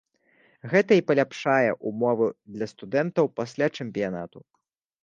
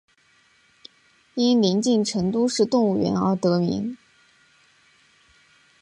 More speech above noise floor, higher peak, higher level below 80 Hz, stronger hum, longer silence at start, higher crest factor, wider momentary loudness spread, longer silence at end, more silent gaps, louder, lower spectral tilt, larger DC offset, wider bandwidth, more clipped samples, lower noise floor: about the same, 38 dB vs 40 dB; about the same, -6 dBFS vs -8 dBFS; second, -68 dBFS vs -60 dBFS; neither; second, 0.65 s vs 1.35 s; about the same, 20 dB vs 16 dB; first, 14 LU vs 10 LU; second, 0.65 s vs 1.85 s; neither; second, -25 LUFS vs -22 LUFS; about the same, -6.5 dB/octave vs -6 dB/octave; neither; second, 7.6 kHz vs 11 kHz; neither; about the same, -63 dBFS vs -60 dBFS